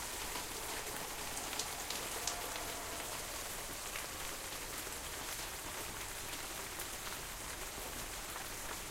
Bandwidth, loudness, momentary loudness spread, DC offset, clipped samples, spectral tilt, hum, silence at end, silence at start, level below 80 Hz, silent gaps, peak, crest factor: 16 kHz; -41 LUFS; 4 LU; under 0.1%; under 0.1%; -1 dB/octave; none; 0 s; 0 s; -56 dBFS; none; -14 dBFS; 28 dB